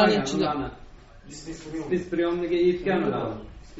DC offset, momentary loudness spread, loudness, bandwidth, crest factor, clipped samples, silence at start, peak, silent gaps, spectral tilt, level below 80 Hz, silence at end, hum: under 0.1%; 16 LU; -26 LUFS; 8 kHz; 18 dB; under 0.1%; 0 s; -8 dBFS; none; -4.5 dB/octave; -48 dBFS; 0 s; none